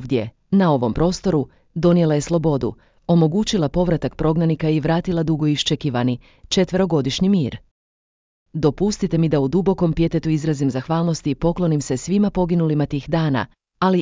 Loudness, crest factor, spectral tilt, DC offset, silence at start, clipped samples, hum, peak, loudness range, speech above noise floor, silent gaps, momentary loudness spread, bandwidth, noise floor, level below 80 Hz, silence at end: -20 LUFS; 16 dB; -6.5 dB/octave; under 0.1%; 0 s; under 0.1%; none; -4 dBFS; 2 LU; over 71 dB; 7.71-8.46 s; 6 LU; 7.6 kHz; under -90 dBFS; -40 dBFS; 0 s